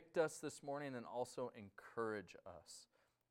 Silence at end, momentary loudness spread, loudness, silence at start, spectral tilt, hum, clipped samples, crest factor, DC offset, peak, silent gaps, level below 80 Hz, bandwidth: 0.45 s; 16 LU; -47 LUFS; 0 s; -4.5 dB/octave; none; under 0.1%; 22 dB; under 0.1%; -26 dBFS; none; -84 dBFS; 16 kHz